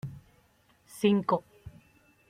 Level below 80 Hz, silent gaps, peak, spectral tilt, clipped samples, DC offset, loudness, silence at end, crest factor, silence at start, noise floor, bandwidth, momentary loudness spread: -64 dBFS; none; -12 dBFS; -6.5 dB/octave; under 0.1%; under 0.1%; -28 LUFS; 0.6 s; 20 dB; 0.05 s; -65 dBFS; 15.5 kHz; 26 LU